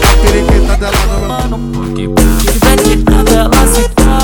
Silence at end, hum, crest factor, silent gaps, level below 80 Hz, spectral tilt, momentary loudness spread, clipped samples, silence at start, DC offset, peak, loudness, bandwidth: 0 s; none; 8 dB; none; -10 dBFS; -4.5 dB/octave; 8 LU; under 0.1%; 0 s; under 0.1%; 0 dBFS; -10 LUFS; over 20 kHz